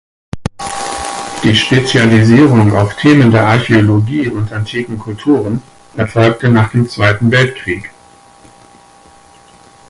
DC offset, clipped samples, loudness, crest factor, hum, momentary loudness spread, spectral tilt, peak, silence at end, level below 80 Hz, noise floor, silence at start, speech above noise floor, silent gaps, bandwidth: under 0.1%; under 0.1%; -11 LUFS; 12 dB; none; 15 LU; -6 dB/octave; 0 dBFS; 2 s; -38 dBFS; -42 dBFS; 0.35 s; 32 dB; none; 11.5 kHz